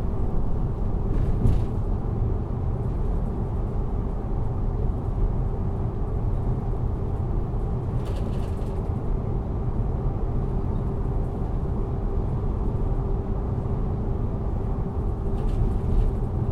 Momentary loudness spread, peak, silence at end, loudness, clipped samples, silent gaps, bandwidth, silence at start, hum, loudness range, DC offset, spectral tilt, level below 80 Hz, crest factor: 3 LU; -8 dBFS; 0 s; -28 LUFS; under 0.1%; none; 4.1 kHz; 0 s; none; 1 LU; under 0.1%; -10.5 dB/octave; -26 dBFS; 16 dB